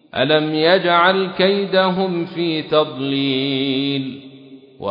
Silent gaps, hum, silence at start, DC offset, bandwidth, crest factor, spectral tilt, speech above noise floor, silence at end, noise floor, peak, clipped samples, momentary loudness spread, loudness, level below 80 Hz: none; none; 0.15 s; under 0.1%; 5.4 kHz; 16 dB; -8.5 dB/octave; 24 dB; 0 s; -42 dBFS; -2 dBFS; under 0.1%; 8 LU; -17 LUFS; -64 dBFS